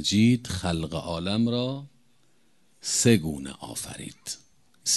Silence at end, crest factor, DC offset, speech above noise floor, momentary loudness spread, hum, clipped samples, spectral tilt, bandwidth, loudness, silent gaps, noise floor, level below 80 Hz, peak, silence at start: 0 s; 22 dB; under 0.1%; 41 dB; 16 LU; none; under 0.1%; -4 dB/octave; 12.5 kHz; -26 LUFS; none; -67 dBFS; -48 dBFS; -6 dBFS; 0 s